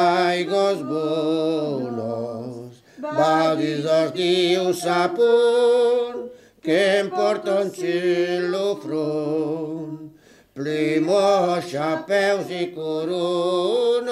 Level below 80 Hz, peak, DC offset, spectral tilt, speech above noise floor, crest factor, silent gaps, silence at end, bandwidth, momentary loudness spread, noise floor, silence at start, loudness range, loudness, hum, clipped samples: -70 dBFS; -8 dBFS; under 0.1%; -5 dB/octave; 28 dB; 14 dB; none; 0 s; 14 kHz; 11 LU; -49 dBFS; 0 s; 4 LU; -21 LUFS; none; under 0.1%